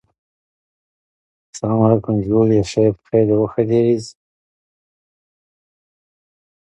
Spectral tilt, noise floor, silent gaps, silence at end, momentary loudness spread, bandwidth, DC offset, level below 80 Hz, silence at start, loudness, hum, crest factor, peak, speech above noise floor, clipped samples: -8 dB/octave; under -90 dBFS; none; 2.65 s; 6 LU; 9.2 kHz; under 0.1%; -50 dBFS; 1.55 s; -17 LUFS; none; 18 dB; -2 dBFS; over 74 dB; under 0.1%